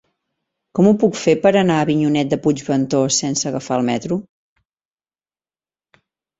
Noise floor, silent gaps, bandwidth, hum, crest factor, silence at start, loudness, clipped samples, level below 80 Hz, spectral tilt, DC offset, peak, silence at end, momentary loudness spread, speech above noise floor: under -90 dBFS; none; 8.4 kHz; none; 18 dB; 0.75 s; -17 LUFS; under 0.1%; -56 dBFS; -5 dB/octave; under 0.1%; -2 dBFS; 2.2 s; 7 LU; over 74 dB